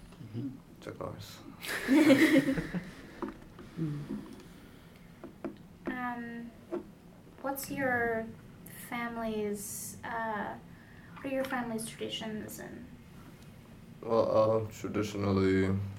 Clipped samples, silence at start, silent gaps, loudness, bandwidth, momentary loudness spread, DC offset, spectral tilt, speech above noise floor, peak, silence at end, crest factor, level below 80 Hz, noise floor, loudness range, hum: under 0.1%; 0 s; none; -32 LUFS; 17 kHz; 24 LU; under 0.1%; -5.5 dB/octave; 22 dB; -10 dBFS; 0 s; 24 dB; -60 dBFS; -54 dBFS; 12 LU; none